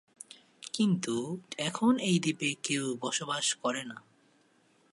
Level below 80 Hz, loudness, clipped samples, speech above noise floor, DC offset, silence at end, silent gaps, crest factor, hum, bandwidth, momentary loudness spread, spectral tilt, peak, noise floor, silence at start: -80 dBFS; -31 LUFS; under 0.1%; 36 dB; under 0.1%; 0.95 s; none; 18 dB; none; 11.5 kHz; 19 LU; -4 dB/octave; -14 dBFS; -67 dBFS; 0.3 s